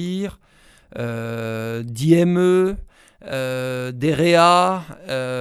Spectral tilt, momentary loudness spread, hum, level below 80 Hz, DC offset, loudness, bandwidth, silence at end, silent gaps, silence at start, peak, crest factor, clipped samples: -6 dB/octave; 15 LU; none; -46 dBFS; under 0.1%; -19 LUFS; 14.5 kHz; 0 s; none; 0 s; -2 dBFS; 18 dB; under 0.1%